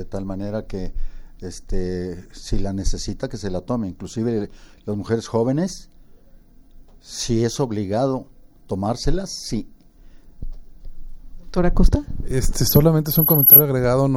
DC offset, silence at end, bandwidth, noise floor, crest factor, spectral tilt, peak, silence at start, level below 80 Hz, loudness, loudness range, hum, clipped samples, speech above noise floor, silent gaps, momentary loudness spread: under 0.1%; 0 s; over 20 kHz; -47 dBFS; 20 dB; -6 dB/octave; 0 dBFS; 0 s; -28 dBFS; -19 LUFS; 12 LU; none; under 0.1%; 27 dB; none; 19 LU